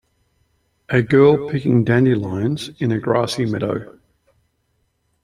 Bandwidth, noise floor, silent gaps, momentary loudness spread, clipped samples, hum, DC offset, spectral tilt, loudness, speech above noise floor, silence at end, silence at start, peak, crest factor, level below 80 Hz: 13 kHz; -67 dBFS; none; 10 LU; under 0.1%; none; under 0.1%; -7.5 dB/octave; -18 LUFS; 50 dB; 1.35 s; 0.9 s; -2 dBFS; 18 dB; -52 dBFS